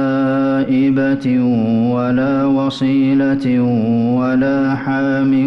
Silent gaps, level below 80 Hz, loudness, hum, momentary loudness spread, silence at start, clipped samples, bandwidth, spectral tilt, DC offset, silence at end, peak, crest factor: none; -50 dBFS; -15 LUFS; none; 2 LU; 0 s; under 0.1%; 6.2 kHz; -8.5 dB/octave; under 0.1%; 0 s; -8 dBFS; 8 dB